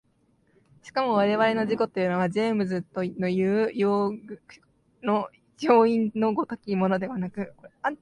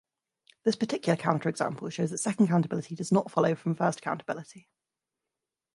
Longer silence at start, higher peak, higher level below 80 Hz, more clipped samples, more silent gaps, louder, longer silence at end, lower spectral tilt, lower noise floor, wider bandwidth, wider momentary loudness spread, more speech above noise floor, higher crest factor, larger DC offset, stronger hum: first, 0.85 s vs 0.65 s; about the same, -6 dBFS vs -8 dBFS; first, -66 dBFS vs -74 dBFS; neither; neither; first, -25 LUFS vs -29 LUFS; second, 0.05 s vs 1.15 s; first, -7.5 dB/octave vs -6 dB/octave; second, -66 dBFS vs -89 dBFS; about the same, 10.5 kHz vs 11.5 kHz; first, 12 LU vs 9 LU; second, 41 dB vs 60 dB; about the same, 20 dB vs 22 dB; neither; neither